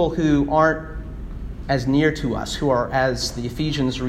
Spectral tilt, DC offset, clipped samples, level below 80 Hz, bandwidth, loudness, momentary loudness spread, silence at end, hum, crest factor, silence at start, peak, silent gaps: -5.5 dB/octave; under 0.1%; under 0.1%; -34 dBFS; 14.5 kHz; -21 LUFS; 16 LU; 0 s; none; 18 dB; 0 s; -4 dBFS; none